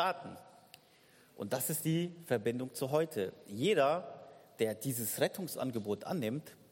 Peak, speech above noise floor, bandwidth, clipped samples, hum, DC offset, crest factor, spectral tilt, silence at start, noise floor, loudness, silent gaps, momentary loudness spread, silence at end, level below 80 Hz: -18 dBFS; 29 dB; 17 kHz; under 0.1%; none; under 0.1%; 18 dB; -4.5 dB/octave; 0 s; -64 dBFS; -35 LUFS; none; 13 LU; 0.15 s; -78 dBFS